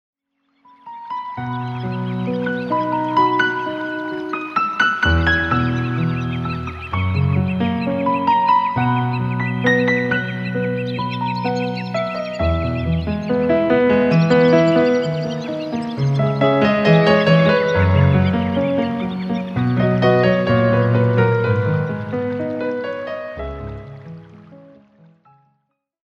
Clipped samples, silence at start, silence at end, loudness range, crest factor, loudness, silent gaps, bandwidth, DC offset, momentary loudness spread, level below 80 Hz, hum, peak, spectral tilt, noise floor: under 0.1%; 0.85 s; 1.5 s; 6 LU; 18 dB; -18 LUFS; none; 7.8 kHz; under 0.1%; 11 LU; -38 dBFS; none; 0 dBFS; -8 dB/octave; -70 dBFS